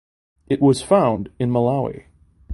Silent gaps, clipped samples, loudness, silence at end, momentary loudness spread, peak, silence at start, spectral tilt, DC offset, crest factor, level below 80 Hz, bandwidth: none; under 0.1%; -19 LUFS; 0 s; 10 LU; -2 dBFS; 0.5 s; -7 dB/octave; under 0.1%; 18 dB; -48 dBFS; 11.5 kHz